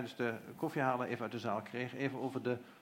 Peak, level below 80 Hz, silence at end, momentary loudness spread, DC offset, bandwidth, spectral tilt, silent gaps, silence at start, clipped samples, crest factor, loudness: -18 dBFS; -84 dBFS; 0 s; 5 LU; under 0.1%; 16.5 kHz; -6.5 dB/octave; none; 0 s; under 0.1%; 20 dB; -39 LUFS